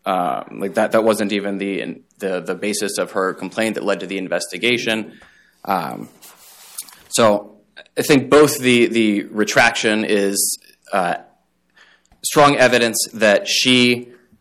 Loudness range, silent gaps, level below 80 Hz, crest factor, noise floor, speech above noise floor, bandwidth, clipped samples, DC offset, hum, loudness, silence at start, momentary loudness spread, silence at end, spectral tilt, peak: 7 LU; none; -56 dBFS; 16 dB; -59 dBFS; 42 dB; 16.5 kHz; under 0.1%; under 0.1%; none; -17 LUFS; 0.05 s; 14 LU; 0.3 s; -3.5 dB/octave; -4 dBFS